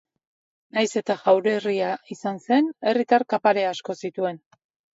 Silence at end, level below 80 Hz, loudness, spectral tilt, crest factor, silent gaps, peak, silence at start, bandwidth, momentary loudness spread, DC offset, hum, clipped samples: 0.6 s; -76 dBFS; -23 LUFS; -5 dB/octave; 18 dB; none; -4 dBFS; 0.75 s; 8 kHz; 11 LU; under 0.1%; none; under 0.1%